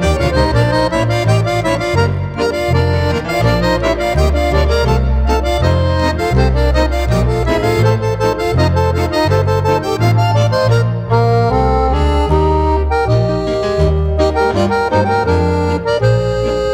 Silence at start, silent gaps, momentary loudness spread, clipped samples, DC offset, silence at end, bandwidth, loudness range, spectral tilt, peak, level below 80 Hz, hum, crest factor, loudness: 0 s; none; 2 LU; under 0.1%; under 0.1%; 0 s; 16 kHz; 1 LU; -6.5 dB/octave; 0 dBFS; -20 dBFS; none; 12 dB; -14 LUFS